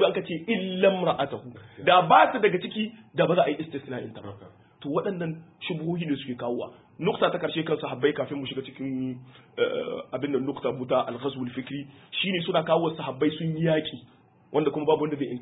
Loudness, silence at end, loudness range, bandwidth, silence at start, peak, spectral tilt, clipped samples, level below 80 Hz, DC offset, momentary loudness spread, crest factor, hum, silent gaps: -26 LUFS; 0 s; 7 LU; 4 kHz; 0 s; -4 dBFS; -10 dB/octave; under 0.1%; -66 dBFS; under 0.1%; 14 LU; 22 dB; none; none